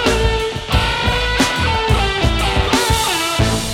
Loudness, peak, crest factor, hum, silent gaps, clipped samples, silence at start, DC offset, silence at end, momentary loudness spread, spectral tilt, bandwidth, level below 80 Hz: -16 LUFS; -2 dBFS; 14 dB; none; none; under 0.1%; 0 s; under 0.1%; 0 s; 2 LU; -4 dB/octave; 16.5 kHz; -22 dBFS